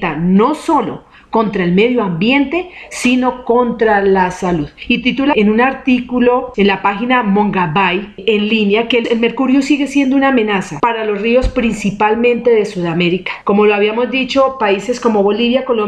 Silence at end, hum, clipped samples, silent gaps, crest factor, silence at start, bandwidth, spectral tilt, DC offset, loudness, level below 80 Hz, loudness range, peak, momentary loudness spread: 0 s; none; under 0.1%; none; 12 dB; 0 s; 11 kHz; -6 dB/octave; under 0.1%; -13 LUFS; -36 dBFS; 1 LU; -2 dBFS; 5 LU